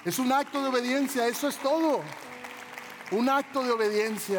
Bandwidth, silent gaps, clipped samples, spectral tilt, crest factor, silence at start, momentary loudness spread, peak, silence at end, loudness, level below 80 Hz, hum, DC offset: 19.5 kHz; none; under 0.1%; -3.5 dB/octave; 14 dB; 0 s; 15 LU; -14 dBFS; 0 s; -27 LUFS; -78 dBFS; none; under 0.1%